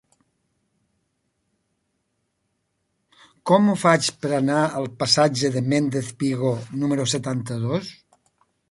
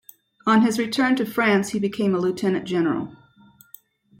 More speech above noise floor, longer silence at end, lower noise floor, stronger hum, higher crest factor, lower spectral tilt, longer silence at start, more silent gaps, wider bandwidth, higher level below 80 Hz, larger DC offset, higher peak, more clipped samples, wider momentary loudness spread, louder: first, 53 dB vs 33 dB; second, 0.8 s vs 1.05 s; first, -74 dBFS vs -53 dBFS; neither; first, 22 dB vs 16 dB; about the same, -5 dB/octave vs -5.5 dB/octave; first, 3.45 s vs 0.45 s; neither; second, 11.5 kHz vs 16.5 kHz; about the same, -62 dBFS vs -64 dBFS; neither; first, -2 dBFS vs -6 dBFS; neither; about the same, 9 LU vs 7 LU; about the same, -21 LUFS vs -22 LUFS